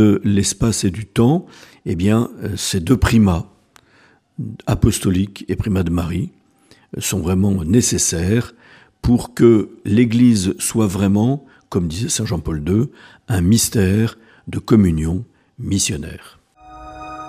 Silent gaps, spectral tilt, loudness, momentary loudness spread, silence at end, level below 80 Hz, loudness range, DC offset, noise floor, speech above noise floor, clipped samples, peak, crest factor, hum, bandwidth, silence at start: none; -5.5 dB/octave; -17 LUFS; 15 LU; 0 s; -36 dBFS; 4 LU; under 0.1%; -53 dBFS; 37 dB; under 0.1%; 0 dBFS; 18 dB; none; 15.5 kHz; 0 s